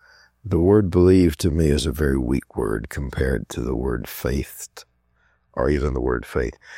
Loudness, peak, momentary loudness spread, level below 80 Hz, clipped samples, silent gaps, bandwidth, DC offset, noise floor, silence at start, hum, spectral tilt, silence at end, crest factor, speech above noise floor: -21 LUFS; -4 dBFS; 13 LU; -32 dBFS; under 0.1%; none; 16.5 kHz; under 0.1%; -64 dBFS; 0.45 s; none; -7 dB/octave; 0 s; 18 dB; 43 dB